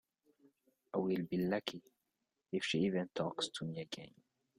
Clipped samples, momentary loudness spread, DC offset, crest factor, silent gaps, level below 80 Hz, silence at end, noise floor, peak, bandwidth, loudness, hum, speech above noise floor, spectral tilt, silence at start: under 0.1%; 12 LU; under 0.1%; 22 dB; none; -76 dBFS; 0.5 s; -88 dBFS; -18 dBFS; 15.5 kHz; -39 LUFS; none; 49 dB; -5.5 dB/octave; 0.95 s